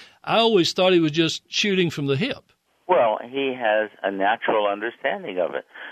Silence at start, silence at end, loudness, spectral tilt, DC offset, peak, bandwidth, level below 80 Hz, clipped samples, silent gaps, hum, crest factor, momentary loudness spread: 0 s; 0 s; -22 LUFS; -4.5 dB/octave; under 0.1%; -6 dBFS; 13.5 kHz; -66 dBFS; under 0.1%; none; none; 16 dB; 9 LU